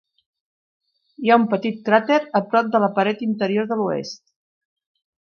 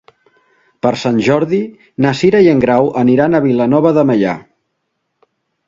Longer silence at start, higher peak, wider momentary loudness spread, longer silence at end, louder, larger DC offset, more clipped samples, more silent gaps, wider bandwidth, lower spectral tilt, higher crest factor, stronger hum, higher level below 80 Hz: first, 1.2 s vs 0.85 s; about the same, -2 dBFS vs 0 dBFS; about the same, 8 LU vs 9 LU; about the same, 1.15 s vs 1.25 s; second, -20 LUFS vs -12 LUFS; neither; neither; neither; second, 6.8 kHz vs 7.6 kHz; about the same, -6.5 dB/octave vs -7.5 dB/octave; first, 20 dB vs 14 dB; neither; second, -72 dBFS vs -52 dBFS